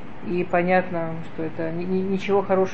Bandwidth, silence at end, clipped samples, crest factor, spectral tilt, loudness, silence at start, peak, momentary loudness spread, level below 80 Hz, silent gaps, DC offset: 7.2 kHz; 0 s; under 0.1%; 16 dB; -8 dB/octave; -24 LUFS; 0 s; -6 dBFS; 10 LU; -54 dBFS; none; 3%